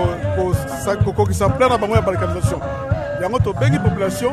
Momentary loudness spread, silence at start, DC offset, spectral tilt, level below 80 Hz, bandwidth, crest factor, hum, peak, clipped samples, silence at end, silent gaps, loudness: 6 LU; 0 s; under 0.1%; -6.5 dB/octave; -32 dBFS; 13.5 kHz; 16 dB; none; -2 dBFS; under 0.1%; 0 s; none; -19 LUFS